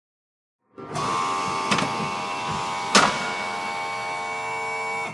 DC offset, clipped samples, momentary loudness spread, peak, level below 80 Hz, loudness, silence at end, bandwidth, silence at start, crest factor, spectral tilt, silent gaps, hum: under 0.1%; under 0.1%; 10 LU; -2 dBFS; -60 dBFS; -24 LUFS; 0 s; 11.5 kHz; 0.8 s; 24 dB; -2.5 dB/octave; none; none